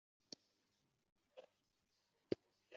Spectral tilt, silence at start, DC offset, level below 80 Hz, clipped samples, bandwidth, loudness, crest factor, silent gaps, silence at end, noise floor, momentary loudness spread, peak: -5 dB/octave; 1.35 s; under 0.1%; -90 dBFS; under 0.1%; 7.2 kHz; -52 LUFS; 32 dB; none; 0 s; -85 dBFS; 17 LU; -24 dBFS